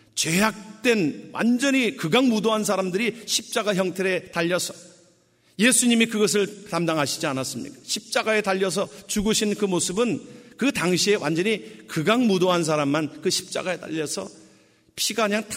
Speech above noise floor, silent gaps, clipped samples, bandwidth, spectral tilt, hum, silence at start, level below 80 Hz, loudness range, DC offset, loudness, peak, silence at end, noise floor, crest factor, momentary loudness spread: 37 dB; none; under 0.1%; 16 kHz; -3.5 dB/octave; none; 0.15 s; -56 dBFS; 2 LU; under 0.1%; -23 LUFS; -4 dBFS; 0 s; -61 dBFS; 20 dB; 9 LU